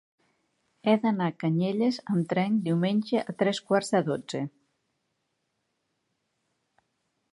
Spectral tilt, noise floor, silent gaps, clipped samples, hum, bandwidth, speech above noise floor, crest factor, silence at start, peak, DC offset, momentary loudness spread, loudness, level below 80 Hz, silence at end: -6.5 dB/octave; -78 dBFS; none; under 0.1%; none; 11.5 kHz; 52 dB; 20 dB; 0.85 s; -10 dBFS; under 0.1%; 7 LU; -27 LUFS; -76 dBFS; 2.85 s